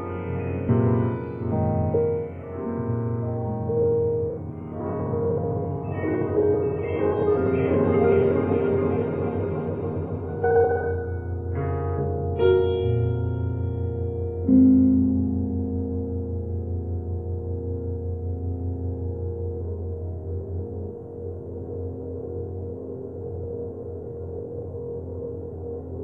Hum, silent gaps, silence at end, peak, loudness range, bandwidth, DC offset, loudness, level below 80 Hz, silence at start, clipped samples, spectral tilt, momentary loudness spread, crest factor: none; none; 0 s; -8 dBFS; 11 LU; 3.5 kHz; under 0.1%; -26 LUFS; -42 dBFS; 0 s; under 0.1%; -12 dB/octave; 14 LU; 18 dB